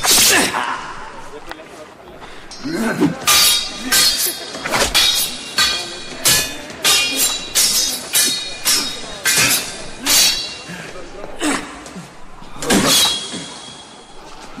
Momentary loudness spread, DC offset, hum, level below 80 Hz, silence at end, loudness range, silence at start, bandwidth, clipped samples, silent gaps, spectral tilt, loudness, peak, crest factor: 22 LU; under 0.1%; none; -40 dBFS; 0 s; 5 LU; 0 s; 16 kHz; under 0.1%; none; -0.5 dB/octave; -14 LUFS; 0 dBFS; 18 dB